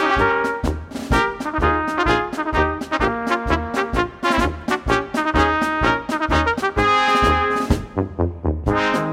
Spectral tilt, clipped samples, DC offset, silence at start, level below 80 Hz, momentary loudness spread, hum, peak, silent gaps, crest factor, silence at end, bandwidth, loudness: -5.5 dB/octave; under 0.1%; under 0.1%; 0 s; -30 dBFS; 6 LU; none; -2 dBFS; none; 16 dB; 0 s; 16 kHz; -20 LUFS